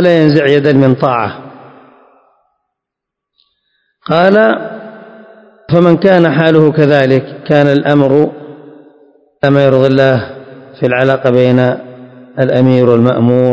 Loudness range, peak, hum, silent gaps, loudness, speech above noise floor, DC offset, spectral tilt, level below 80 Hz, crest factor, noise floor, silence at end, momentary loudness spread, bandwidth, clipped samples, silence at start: 6 LU; 0 dBFS; none; none; -10 LUFS; 71 dB; under 0.1%; -8.5 dB/octave; -52 dBFS; 10 dB; -80 dBFS; 0 s; 12 LU; 8 kHz; 1%; 0 s